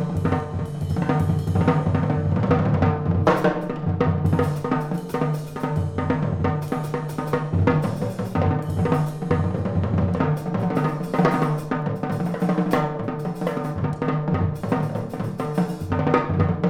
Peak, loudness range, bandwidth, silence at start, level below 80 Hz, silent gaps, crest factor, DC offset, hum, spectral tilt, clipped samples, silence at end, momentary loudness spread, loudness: -4 dBFS; 3 LU; 15.5 kHz; 0 s; -44 dBFS; none; 18 dB; under 0.1%; none; -8.5 dB/octave; under 0.1%; 0 s; 6 LU; -23 LUFS